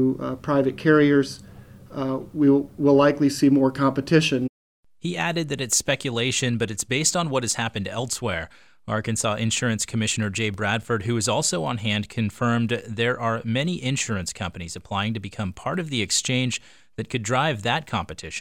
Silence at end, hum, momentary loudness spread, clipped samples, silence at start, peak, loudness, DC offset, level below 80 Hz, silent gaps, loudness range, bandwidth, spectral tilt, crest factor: 0 s; none; 11 LU; under 0.1%; 0 s; -4 dBFS; -23 LUFS; 0.2%; -54 dBFS; 4.49-4.83 s; 5 LU; 16.5 kHz; -4.5 dB/octave; 20 dB